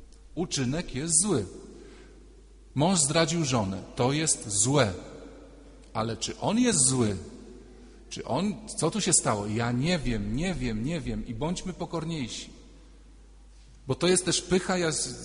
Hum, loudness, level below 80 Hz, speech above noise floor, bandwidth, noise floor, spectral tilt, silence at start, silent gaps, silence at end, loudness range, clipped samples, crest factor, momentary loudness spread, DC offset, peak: none; -27 LUFS; -46 dBFS; 24 dB; 11 kHz; -51 dBFS; -4 dB/octave; 0 s; none; 0 s; 6 LU; under 0.1%; 20 dB; 16 LU; under 0.1%; -8 dBFS